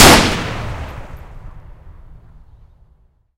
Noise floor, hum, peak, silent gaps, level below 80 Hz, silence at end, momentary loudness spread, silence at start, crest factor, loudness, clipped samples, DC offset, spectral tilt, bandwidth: -54 dBFS; none; 0 dBFS; none; -28 dBFS; 1.5 s; 29 LU; 0 s; 16 dB; -14 LUFS; 0.5%; under 0.1%; -3 dB/octave; over 20 kHz